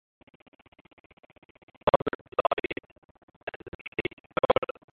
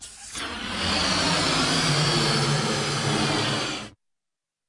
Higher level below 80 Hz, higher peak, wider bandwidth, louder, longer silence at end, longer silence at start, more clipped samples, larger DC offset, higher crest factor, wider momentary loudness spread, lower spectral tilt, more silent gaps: second, -56 dBFS vs -48 dBFS; first, -6 dBFS vs -10 dBFS; second, 4.5 kHz vs 11.5 kHz; second, -29 LUFS vs -23 LUFS; second, 0.3 s vs 0.8 s; first, 1.85 s vs 0 s; neither; neither; first, 26 dB vs 16 dB; first, 16 LU vs 11 LU; first, -9 dB/octave vs -3.5 dB/octave; first, 1.96-2.06 s, 2.15-2.25 s, 2.92-3.15 s, 3.23-3.28 s, 3.36-3.47 s, 3.56-3.60 s, 3.68-3.92 s, 4.13-4.30 s vs none